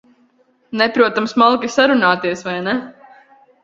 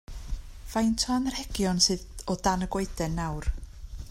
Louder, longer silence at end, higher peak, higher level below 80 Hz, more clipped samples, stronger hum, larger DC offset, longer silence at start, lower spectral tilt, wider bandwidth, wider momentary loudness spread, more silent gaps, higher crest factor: first, -16 LUFS vs -28 LUFS; first, 0.7 s vs 0 s; first, 0 dBFS vs -8 dBFS; second, -60 dBFS vs -38 dBFS; neither; neither; neither; first, 0.7 s vs 0.1 s; about the same, -4.5 dB/octave vs -4 dB/octave; second, 7.8 kHz vs 16 kHz; second, 9 LU vs 18 LU; neither; about the same, 18 dB vs 20 dB